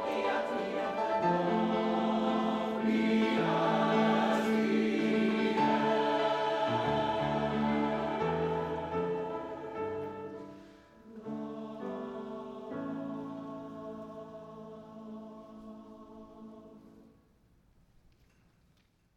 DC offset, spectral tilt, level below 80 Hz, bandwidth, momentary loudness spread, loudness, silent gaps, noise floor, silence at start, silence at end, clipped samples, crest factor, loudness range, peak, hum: under 0.1%; -6.5 dB/octave; -64 dBFS; 9.4 kHz; 20 LU; -32 LUFS; none; -69 dBFS; 0 s; 2.15 s; under 0.1%; 18 dB; 19 LU; -16 dBFS; none